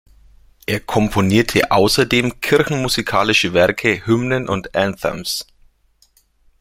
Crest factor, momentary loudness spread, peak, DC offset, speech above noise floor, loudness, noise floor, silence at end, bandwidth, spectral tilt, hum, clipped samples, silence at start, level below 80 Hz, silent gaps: 18 dB; 9 LU; 0 dBFS; under 0.1%; 40 dB; -17 LUFS; -57 dBFS; 1.2 s; 16.5 kHz; -4.5 dB/octave; none; under 0.1%; 0.7 s; -42 dBFS; none